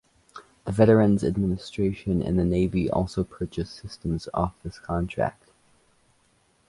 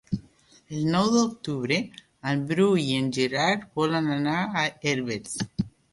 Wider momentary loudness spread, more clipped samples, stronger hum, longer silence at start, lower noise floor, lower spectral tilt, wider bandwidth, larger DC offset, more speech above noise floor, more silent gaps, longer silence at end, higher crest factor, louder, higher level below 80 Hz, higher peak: about the same, 13 LU vs 11 LU; neither; neither; first, 0.35 s vs 0.1 s; first, -65 dBFS vs -57 dBFS; first, -8 dB/octave vs -5 dB/octave; about the same, 11.5 kHz vs 11.5 kHz; neither; first, 41 dB vs 32 dB; neither; first, 1.4 s vs 0.25 s; about the same, 20 dB vs 16 dB; about the same, -25 LUFS vs -26 LUFS; first, -42 dBFS vs -58 dBFS; first, -6 dBFS vs -10 dBFS